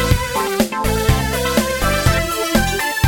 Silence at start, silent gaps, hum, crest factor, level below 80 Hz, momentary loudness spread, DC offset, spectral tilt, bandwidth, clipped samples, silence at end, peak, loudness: 0 s; none; none; 14 dB; -26 dBFS; 2 LU; under 0.1%; -4.5 dB/octave; over 20 kHz; under 0.1%; 0 s; -4 dBFS; -17 LUFS